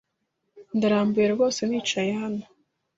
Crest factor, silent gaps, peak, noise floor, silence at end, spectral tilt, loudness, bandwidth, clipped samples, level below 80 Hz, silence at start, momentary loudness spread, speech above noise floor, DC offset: 16 dB; none; -10 dBFS; -77 dBFS; 0.55 s; -5 dB/octave; -24 LUFS; 8 kHz; under 0.1%; -66 dBFS; 0.55 s; 9 LU; 54 dB; under 0.1%